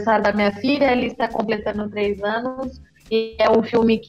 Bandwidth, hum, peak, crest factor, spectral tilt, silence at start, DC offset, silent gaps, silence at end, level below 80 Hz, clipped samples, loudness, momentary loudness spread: 7.8 kHz; none; -6 dBFS; 14 dB; -6.5 dB/octave; 0 s; under 0.1%; none; 0.05 s; -48 dBFS; under 0.1%; -20 LUFS; 8 LU